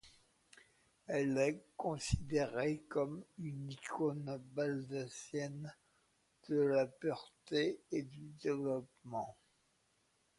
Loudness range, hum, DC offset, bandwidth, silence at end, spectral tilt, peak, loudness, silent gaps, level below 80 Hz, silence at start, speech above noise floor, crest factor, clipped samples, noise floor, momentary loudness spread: 3 LU; none; under 0.1%; 11.5 kHz; 1.05 s; -6 dB/octave; -20 dBFS; -40 LUFS; none; -58 dBFS; 0.05 s; 38 dB; 20 dB; under 0.1%; -77 dBFS; 11 LU